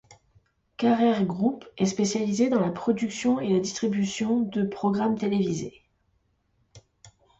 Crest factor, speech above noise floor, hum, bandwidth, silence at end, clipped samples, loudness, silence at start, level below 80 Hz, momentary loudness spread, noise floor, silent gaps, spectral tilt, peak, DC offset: 16 dB; 45 dB; none; 8.2 kHz; 0.3 s; under 0.1%; -25 LUFS; 0.1 s; -62 dBFS; 5 LU; -70 dBFS; none; -5.5 dB/octave; -12 dBFS; under 0.1%